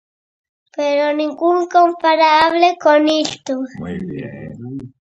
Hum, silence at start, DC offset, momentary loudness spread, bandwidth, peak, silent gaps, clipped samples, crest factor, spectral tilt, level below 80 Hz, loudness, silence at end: none; 0.75 s; under 0.1%; 18 LU; 8.6 kHz; 0 dBFS; none; under 0.1%; 16 dB; -4.5 dB/octave; -54 dBFS; -15 LUFS; 0.15 s